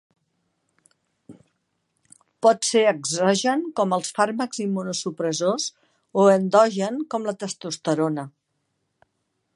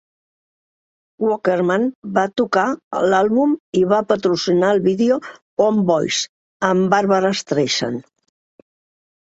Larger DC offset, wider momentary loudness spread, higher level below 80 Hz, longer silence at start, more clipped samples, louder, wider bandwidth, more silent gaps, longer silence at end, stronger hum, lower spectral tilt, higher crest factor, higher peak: neither; first, 11 LU vs 6 LU; second, -76 dBFS vs -62 dBFS; about the same, 1.3 s vs 1.2 s; neither; second, -22 LUFS vs -18 LUFS; first, 11.5 kHz vs 8 kHz; second, none vs 1.95-2.02 s, 2.84-2.91 s, 3.60-3.73 s, 5.42-5.57 s, 6.29-6.60 s; about the same, 1.25 s vs 1.2 s; neither; about the same, -4 dB/octave vs -5 dB/octave; about the same, 20 dB vs 16 dB; about the same, -4 dBFS vs -2 dBFS